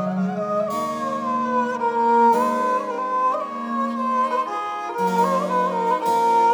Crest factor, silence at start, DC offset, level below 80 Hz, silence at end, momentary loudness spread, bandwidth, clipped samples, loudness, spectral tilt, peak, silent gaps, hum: 14 dB; 0 s; under 0.1%; -68 dBFS; 0 s; 8 LU; 20 kHz; under 0.1%; -21 LUFS; -6 dB/octave; -6 dBFS; none; none